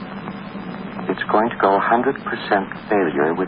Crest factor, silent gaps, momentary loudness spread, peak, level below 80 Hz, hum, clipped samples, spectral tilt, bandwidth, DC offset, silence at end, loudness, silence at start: 16 dB; none; 14 LU; -4 dBFS; -54 dBFS; none; under 0.1%; -11 dB/octave; 5.2 kHz; under 0.1%; 0 s; -20 LUFS; 0 s